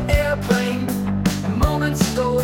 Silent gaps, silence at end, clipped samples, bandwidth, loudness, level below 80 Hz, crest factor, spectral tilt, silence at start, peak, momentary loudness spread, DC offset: none; 0 s; under 0.1%; 17 kHz; -20 LUFS; -28 dBFS; 16 dB; -5.5 dB/octave; 0 s; -4 dBFS; 3 LU; under 0.1%